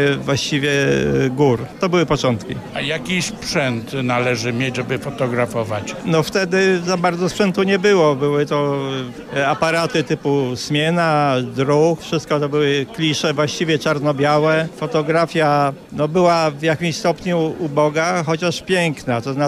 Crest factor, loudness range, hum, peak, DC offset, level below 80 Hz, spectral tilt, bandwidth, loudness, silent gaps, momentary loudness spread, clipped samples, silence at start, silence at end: 14 dB; 3 LU; none; -4 dBFS; under 0.1%; -48 dBFS; -5.5 dB/octave; 15 kHz; -18 LUFS; none; 6 LU; under 0.1%; 0 s; 0 s